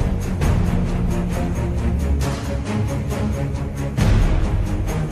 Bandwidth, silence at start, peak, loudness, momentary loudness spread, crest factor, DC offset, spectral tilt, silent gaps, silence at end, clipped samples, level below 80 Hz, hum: 14 kHz; 0 s; -6 dBFS; -22 LUFS; 5 LU; 14 dB; under 0.1%; -7 dB/octave; none; 0 s; under 0.1%; -22 dBFS; none